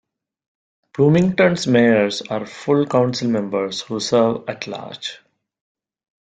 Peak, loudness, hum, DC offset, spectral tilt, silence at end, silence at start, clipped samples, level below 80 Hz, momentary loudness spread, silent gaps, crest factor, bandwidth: -2 dBFS; -18 LUFS; none; under 0.1%; -6 dB/octave; 1.15 s; 1 s; under 0.1%; -58 dBFS; 14 LU; none; 18 dB; 9.2 kHz